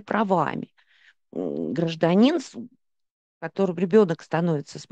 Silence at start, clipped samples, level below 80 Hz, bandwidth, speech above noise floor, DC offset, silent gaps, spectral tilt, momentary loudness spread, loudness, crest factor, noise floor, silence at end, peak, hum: 0.05 s; under 0.1%; -72 dBFS; 9 kHz; 37 dB; under 0.1%; 3.11-3.41 s; -7 dB/octave; 18 LU; -23 LUFS; 18 dB; -60 dBFS; 0.1 s; -6 dBFS; none